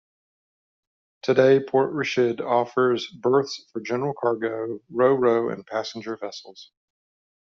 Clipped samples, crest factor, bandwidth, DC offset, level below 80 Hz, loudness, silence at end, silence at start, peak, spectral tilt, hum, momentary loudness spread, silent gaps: under 0.1%; 20 dB; 7.2 kHz; under 0.1%; -70 dBFS; -23 LUFS; 0.8 s; 1.25 s; -4 dBFS; -6 dB/octave; none; 14 LU; none